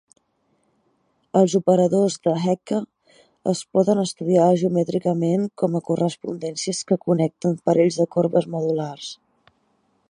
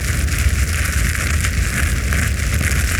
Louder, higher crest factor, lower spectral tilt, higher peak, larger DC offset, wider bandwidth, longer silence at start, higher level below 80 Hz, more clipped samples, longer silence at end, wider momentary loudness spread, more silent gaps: second, -21 LUFS vs -18 LUFS; about the same, 18 dB vs 16 dB; first, -6.5 dB/octave vs -3.5 dB/octave; about the same, -4 dBFS vs -2 dBFS; neither; second, 11.5 kHz vs over 20 kHz; first, 1.35 s vs 0 s; second, -68 dBFS vs -20 dBFS; neither; first, 0.95 s vs 0 s; first, 9 LU vs 1 LU; neither